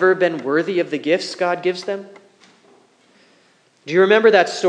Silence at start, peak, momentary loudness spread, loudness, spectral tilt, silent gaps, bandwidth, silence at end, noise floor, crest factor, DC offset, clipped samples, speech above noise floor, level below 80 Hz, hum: 0 s; 0 dBFS; 14 LU; -18 LUFS; -4.5 dB/octave; none; 9.8 kHz; 0 s; -57 dBFS; 18 dB; under 0.1%; under 0.1%; 40 dB; -82 dBFS; none